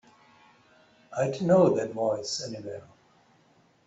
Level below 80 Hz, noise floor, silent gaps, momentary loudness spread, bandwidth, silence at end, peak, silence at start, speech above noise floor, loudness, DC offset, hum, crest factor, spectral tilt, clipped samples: -68 dBFS; -63 dBFS; none; 18 LU; 8.2 kHz; 1.05 s; -8 dBFS; 1.1 s; 37 dB; -27 LUFS; under 0.1%; none; 20 dB; -5.5 dB/octave; under 0.1%